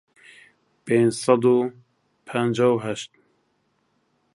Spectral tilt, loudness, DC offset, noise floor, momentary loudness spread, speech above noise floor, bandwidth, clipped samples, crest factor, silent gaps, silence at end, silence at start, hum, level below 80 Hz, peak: -6 dB/octave; -22 LUFS; under 0.1%; -69 dBFS; 14 LU; 49 dB; 11.5 kHz; under 0.1%; 20 dB; none; 1.3 s; 0.85 s; none; -68 dBFS; -4 dBFS